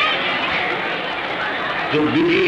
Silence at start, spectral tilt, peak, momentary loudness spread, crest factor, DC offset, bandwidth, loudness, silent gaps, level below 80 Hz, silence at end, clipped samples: 0 s; -5.5 dB/octave; -6 dBFS; 5 LU; 14 dB; under 0.1%; 9.6 kHz; -19 LUFS; none; -52 dBFS; 0 s; under 0.1%